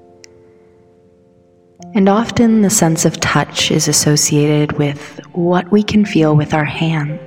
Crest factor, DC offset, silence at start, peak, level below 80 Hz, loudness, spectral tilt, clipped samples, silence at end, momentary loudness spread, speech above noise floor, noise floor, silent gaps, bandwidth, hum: 14 dB; 0.2%; 1.8 s; 0 dBFS; -46 dBFS; -13 LUFS; -4.5 dB/octave; under 0.1%; 0 s; 7 LU; 36 dB; -49 dBFS; none; 17 kHz; none